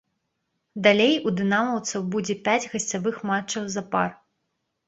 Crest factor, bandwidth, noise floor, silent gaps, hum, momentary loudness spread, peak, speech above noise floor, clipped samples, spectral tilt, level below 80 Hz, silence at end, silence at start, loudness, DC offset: 22 dB; 8.2 kHz; -77 dBFS; none; none; 9 LU; -4 dBFS; 54 dB; under 0.1%; -4 dB/octave; -66 dBFS; 0.75 s; 0.75 s; -24 LUFS; under 0.1%